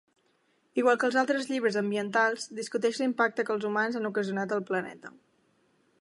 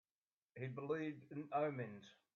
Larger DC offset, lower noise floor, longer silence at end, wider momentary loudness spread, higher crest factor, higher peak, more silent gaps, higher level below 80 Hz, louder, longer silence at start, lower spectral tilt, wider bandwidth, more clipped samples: neither; second, -70 dBFS vs under -90 dBFS; first, 0.9 s vs 0.25 s; second, 9 LU vs 12 LU; about the same, 18 dB vs 18 dB; first, -10 dBFS vs -28 dBFS; neither; first, -82 dBFS vs -88 dBFS; first, -28 LUFS vs -45 LUFS; first, 0.75 s vs 0.55 s; second, -4.5 dB/octave vs -6.5 dB/octave; first, 11.5 kHz vs 7 kHz; neither